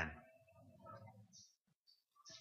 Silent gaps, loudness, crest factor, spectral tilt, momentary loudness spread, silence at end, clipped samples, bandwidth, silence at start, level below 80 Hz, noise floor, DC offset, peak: 1.61-1.65 s, 1.76-1.85 s; -57 LUFS; 28 dB; -4 dB/octave; 11 LU; 0 s; under 0.1%; 15 kHz; 0 s; -68 dBFS; -77 dBFS; under 0.1%; -28 dBFS